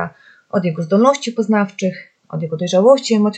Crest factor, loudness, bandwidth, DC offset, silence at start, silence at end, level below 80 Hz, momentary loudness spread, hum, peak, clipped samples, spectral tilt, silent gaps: 16 dB; -16 LUFS; 8.8 kHz; under 0.1%; 0 s; 0 s; -68 dBFS; 14 LU; none; 0 dBFS; under 0.1%; -6 dB/octave; none